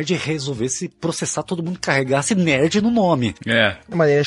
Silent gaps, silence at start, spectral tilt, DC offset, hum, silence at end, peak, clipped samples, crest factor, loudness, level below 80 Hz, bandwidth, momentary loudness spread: none; 0 s; -4.5 dB/octave; under 0.1%; none; 0 s; -2 dBFS; under 0.1%; 18 dB; -19 LUFS; -52 dBFS; 11.5 kHz; 7 LU